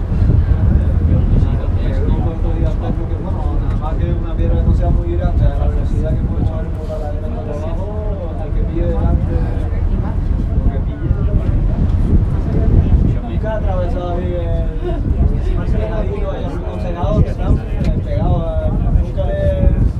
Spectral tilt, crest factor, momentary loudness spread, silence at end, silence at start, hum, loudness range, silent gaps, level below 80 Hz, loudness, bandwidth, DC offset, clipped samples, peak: -10 dB/octave; 14 dB; 8 LU; 0 s; 0 s; none; 3 LU; none; -18 dBFS; -18 LUFS; 4.7 kHz; under 0.1%; under 0.1%; 0 dBFS